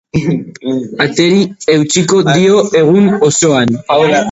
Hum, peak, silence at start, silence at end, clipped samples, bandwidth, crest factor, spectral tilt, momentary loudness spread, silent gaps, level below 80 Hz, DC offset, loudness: none; 0 dBFS; 0.15 s; 0 s; under 0.1%; 8.2 kHz; 10 dB; -4.5 dB/octave; 8 LU; none; -44 dBFS; under 0.1%; -11 LUFS